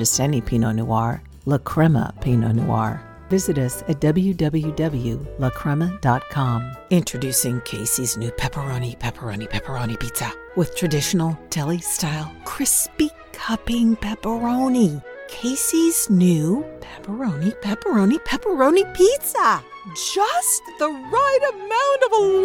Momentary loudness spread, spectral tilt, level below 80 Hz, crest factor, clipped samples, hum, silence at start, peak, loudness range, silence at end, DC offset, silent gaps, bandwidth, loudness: 10 LU; -5 dB/octave; -42 dBFS; 16 dB; under 0.1%; none; 0 s; -4 dBFS; 5 LU; 0 s; under 0.1%; none; 18 kHz; -21 LUFS